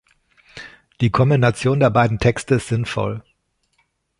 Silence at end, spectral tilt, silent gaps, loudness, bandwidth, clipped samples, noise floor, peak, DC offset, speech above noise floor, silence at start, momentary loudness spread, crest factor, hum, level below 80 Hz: 1 s; -6.5 dB/octave; none; -18 LUFS; 11.5 kHz; under 0.1%; -67 dBFS; -2 dBFS; under 0.1%; 49 dB; 0.55 s; 19 LU; 18 dB; none; -44 dBFS